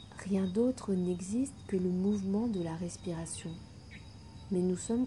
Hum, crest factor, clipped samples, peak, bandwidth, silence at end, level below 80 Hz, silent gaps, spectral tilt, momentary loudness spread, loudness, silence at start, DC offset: none; 14 dB; under 0.1%; -20 dBFS; 11.5 kHz; 0 s; -58 dBFS; none; -6.5 dB/octave; 19 LU; -34 LUFS; 0 s; under 0.1%